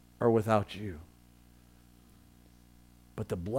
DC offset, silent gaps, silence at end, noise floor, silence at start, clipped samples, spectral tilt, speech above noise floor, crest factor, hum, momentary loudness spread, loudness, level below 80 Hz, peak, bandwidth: under 0.1%; none; 0 s; -59 dBFS; 0.2 s; under 0.1%; -7.5 dB/octave; 29 dB; 22 dB; 60 Hz at -60 dBFS; 19 LU; -31 LUFS; -58 dBFS; -12 dBFS; 16.5 kHz